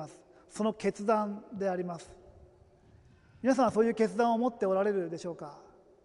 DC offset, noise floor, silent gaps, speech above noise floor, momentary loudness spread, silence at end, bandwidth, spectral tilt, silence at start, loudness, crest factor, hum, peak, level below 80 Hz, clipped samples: under 0.1%; -60 dBFS; none; 30 dB; 17 LU; 0.45 s; 11.5 kHz; -6 dB/octave; 0 s; -31 LUFS; 18 dB; none; -14 dBFS; -66 dBFS; under 0.1%